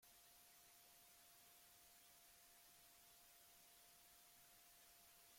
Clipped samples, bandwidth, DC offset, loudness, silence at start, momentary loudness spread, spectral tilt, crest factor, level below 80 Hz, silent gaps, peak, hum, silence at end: under 0.1%; 16.5 kHz; under 0.1%; -67 LUFS; 0 s; 0 LU; 0 dB/octave; 14 dB; -90 dBFS; none; -56 dBFS; none; 0 s